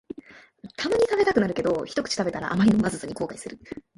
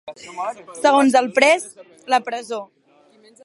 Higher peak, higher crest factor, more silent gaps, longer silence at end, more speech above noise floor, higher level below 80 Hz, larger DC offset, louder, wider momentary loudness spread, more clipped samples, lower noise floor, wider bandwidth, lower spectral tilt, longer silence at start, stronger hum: second, -6 dBFS vs 0 dBFS; about the same, 20 dB vs 20 dB; neither; second, 0.15 s vs 0.8 s; second, 23 dB vs 35 dB; first, -54 dBFS vs -72 dBFS; neither; second, -24 LUFS vs -18 LUFS; first, 19 LU vs 16 LU; neither; second, -48 dBFS vs -54 dBFS; about the same, 11.5 kHz vs 11.5 kHz; first, -5.5 dB/octave vs -2.5 dB/octave; first, 0.3 s vs 0.05 s; neither